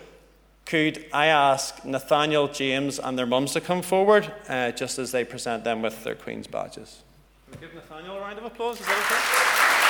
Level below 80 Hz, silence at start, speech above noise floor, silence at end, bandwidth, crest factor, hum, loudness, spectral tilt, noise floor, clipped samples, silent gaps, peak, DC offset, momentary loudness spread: -60 dBFS; 0 s; 31 dB; 0 s; over 20 kHz; 20 dB; none; -24 LUFS; -3 dB/octave; -56 dBFS; under 0.1%; none; -6 dBFS; under 0.1%; 17 LU